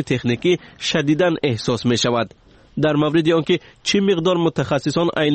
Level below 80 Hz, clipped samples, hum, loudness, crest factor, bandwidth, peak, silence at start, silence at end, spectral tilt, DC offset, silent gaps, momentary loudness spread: -52 dBFS; under 0.1%; none; -19 LUFS; 12 dB; 8.8 kHz; -6 dBFS; 0 s; 0 s; -5.5 dB/octave; under 0.1%; none; 5 LU